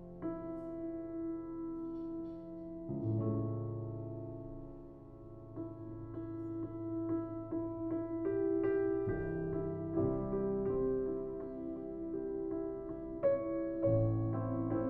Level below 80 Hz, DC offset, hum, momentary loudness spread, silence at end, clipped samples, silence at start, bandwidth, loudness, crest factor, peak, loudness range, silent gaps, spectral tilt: -56 dBFS; under 0.1%; none; 13 LU; 0 s; under 0.1%; 0 s; 2.9 kHz; -38 LUFS; 16 dB; -20 dBFS; 7 LU; none; -11.5 dB/octave